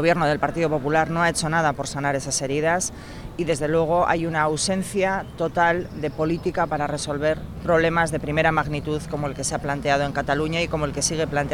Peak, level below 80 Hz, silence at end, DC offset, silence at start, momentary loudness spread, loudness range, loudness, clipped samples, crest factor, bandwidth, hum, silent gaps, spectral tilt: -6 dBFS; -42 dBFS; 0 s; under 0.1%; 0 s; 6 LU; 1 LU; -23 LUFS; under 0.1%; 16 dB; 16.5 kHz; none; none; -4.5 dB/octave